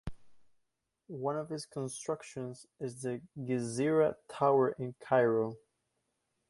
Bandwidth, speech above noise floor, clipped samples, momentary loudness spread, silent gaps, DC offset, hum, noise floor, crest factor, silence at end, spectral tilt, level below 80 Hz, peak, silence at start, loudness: 11.5 kHz; 49 dB; under 0.1%; 15 LU; none; under 0.1%; none; -82 dBFS; 20 dB; 0.9 s; -6 dB/octave; -64 dBFS; -14 dBFS; 0.05 s; -33 LUFS